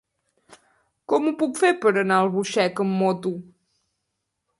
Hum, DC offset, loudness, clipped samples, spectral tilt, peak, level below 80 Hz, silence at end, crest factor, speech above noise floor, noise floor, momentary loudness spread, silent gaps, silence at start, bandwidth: none; under 0.1%; -22 LUFS; under 0.1%; -5.5 dB/octave; -6 dBFS; -72 dBFS; 1.15 s; 18 dB; 57 dB; -79 dBFS; 7 LU; none; 1.1 s; 11.5 kHz